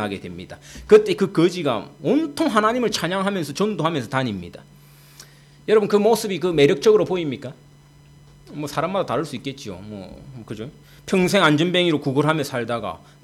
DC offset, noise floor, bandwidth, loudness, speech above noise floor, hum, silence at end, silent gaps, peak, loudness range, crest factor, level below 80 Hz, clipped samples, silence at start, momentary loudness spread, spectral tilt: under 0.1%; -49 dBFS; 14.5 kHz; -20 LUFS; 28 dB; none; 0.25 s; none; -4 dBFS; 8 LU; 18 dB; -54 dBFS; under 0.1%; 0 s; 20 LU; -5.5 dB/octave